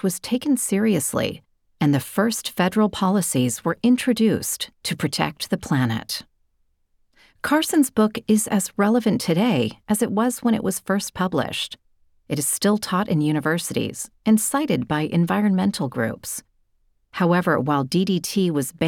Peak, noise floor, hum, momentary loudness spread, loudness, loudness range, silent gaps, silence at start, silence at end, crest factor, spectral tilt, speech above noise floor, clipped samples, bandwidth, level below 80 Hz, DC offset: -4 dBFS; -66 dBFS; none; 7 LU; -22 LUFS; 3 LU; none; 0.05 s; 0 s; 18 dB; -5 dB/octave; 45 dB; under 0.1%; 18.5 kHz; -56 dBFS; under 0.1%